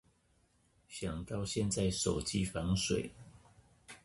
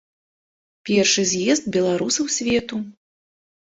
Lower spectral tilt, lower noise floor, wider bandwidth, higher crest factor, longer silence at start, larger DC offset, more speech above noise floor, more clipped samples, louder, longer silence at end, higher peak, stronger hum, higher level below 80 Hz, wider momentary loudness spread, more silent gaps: first, -4.5 dB/octave vs -3 dB/octave; second, -72 dBFS vs under -90 dBFS; first, 11.5 kHz vs 8.2 kHz; about the same, 18 dB vs 18 dB; about the same, 0.9 s vs 0.85 s; neither; second, 37 dB vs over 70 dB; neither; second, -36 LUFS vs -20 LUFS; second, 0.1 s vs 0.7 s; second, -20 dBFS vs -4 dBFS; neither; about the same, -52 dBFS vs -56 dBFS; about the same, 12 LU vs 14 LU; neither